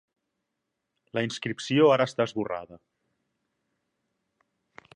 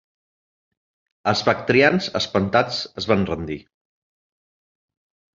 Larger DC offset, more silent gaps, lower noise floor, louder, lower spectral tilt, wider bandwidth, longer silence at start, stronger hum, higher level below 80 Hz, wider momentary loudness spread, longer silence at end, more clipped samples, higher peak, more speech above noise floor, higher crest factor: neither; neither; second, -83 dBFS vs under -90 dBFS; second, -26 LUFS vs -20 LUFS; about the same, -5.5 dB/octave vs -5 dB/octave; first, 10 kHz vs 7.6 kHz; about the same, 1.15 s vs 1.25 s; neither; second, -72 dBFS vs -50 dBFS; about the same, 13 LU vs 12 LU; first, 2.2 s vs 1.8 s; neither; second, -8 dBFS vs 0 dBFS; second, 57 dB vs over 70 dB; about the same, 22 dB vs 22 dB